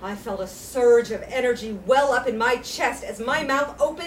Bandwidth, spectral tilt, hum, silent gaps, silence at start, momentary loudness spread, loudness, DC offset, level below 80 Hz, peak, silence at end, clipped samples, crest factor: 16 kHz; -3.5 dB/octave; none; none; 0 s; 12 LU; -23 LUFS; under 0.1%; -50 dBFS; -6 dBFS; 0 s; under 0.1%; 16 dB